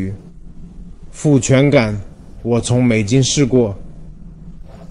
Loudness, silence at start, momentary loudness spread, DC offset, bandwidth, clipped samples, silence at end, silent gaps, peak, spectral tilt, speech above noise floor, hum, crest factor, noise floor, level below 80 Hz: -15 LUFS; 0 s; 16 LU; 0.3%; 11.5 kHz; under 0.1%; 0.05 s; none; -2 dBFS; -5.5 dB/octave; 20 dB; none; 14 dB; -34 dBFS; -36 dBFS